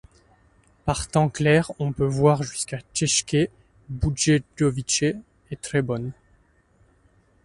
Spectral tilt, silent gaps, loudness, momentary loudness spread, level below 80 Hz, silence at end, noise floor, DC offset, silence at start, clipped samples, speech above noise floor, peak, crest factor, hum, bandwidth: -4.5 dB/octave; none; -23 LUFS; 11 LU; -44 dBFS; 1.3 s; -60 dBFS; under 0.1%; 0.85 s; under 0.1%; 38 dB; -4 dBFS; 20 dB; none; 11.5 kHz